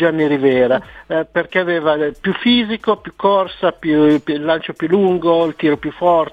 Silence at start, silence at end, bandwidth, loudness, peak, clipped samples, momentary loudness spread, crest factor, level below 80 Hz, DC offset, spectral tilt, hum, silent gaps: 0 s; 0.05 s; 7 kHz; -16 LUFS; -2 dBFS; under 0.1%; 5 LU; 14 dB; -50 dBFS; under 0.1%; -7.5 dB/octave; none; none